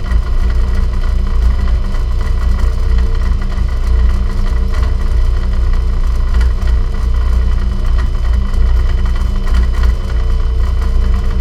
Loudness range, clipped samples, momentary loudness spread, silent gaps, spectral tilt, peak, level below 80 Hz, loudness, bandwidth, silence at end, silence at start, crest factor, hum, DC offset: 1 LU; under 0.1%; 3 LU; none; -7 dB/octave; 0 dBFS; -12 dBFS; -16 LUFS; 7.4 kHz; 0 s; 0 s; 10 dB; 60 Hz at -20 dBFS; under 0.1%